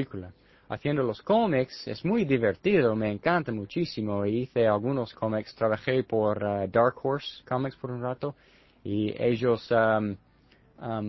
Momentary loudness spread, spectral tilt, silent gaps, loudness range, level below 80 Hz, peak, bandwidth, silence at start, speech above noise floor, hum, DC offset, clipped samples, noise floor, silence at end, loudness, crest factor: 11 LU; -8 dB/octave; none; 3 LU; -58 dBFS; -8 dBFS; 6 kHz; 0 s; 33 dB; none; under 0.1%; under 0.1%; -60 dBFS; 0 s; -27 LUFS; 18 dB